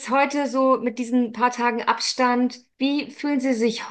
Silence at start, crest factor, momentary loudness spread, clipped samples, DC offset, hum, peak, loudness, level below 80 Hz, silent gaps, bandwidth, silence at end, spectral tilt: 0 s; 18 dB; 5 LU; under 0.1%; under 0.1%; none; -4 dBFS; -22 LUFS; -74 dBFS; none; 9.4 kHz; 0 s; -3.5 dB/octave